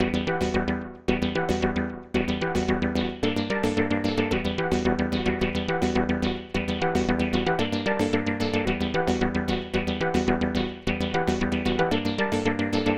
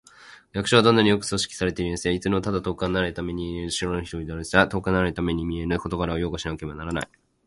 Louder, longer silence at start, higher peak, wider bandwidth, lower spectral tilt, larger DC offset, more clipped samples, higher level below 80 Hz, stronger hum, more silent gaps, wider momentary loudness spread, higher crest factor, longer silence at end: about the same, -26 LUFS vs -24 LUFS; second, 0 s vs 0.2 s; second, -8 dBFS vs -2 dBFS; first, 14.5 kHz vs 11.5 kHz; about the same, -6 dB/octave vs -5 dB/octave; neither; neither; about the same, -44 dBFS vs -42 dBFS; neither; neither; second, 3 LU vs 12 LU; second, 18 dB vs 24 dB; second, 0 s vs 0.4 s